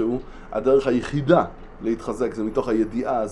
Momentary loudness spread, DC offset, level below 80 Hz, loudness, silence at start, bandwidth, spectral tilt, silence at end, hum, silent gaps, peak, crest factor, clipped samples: 12 LU; under 0.1%; -42 dBFS; -23 LUFS; 0 s; 11.5 kHz; -7.5 dB/octave; 0 s; none; none; -4 dBFS; 20 dB; under 0.1%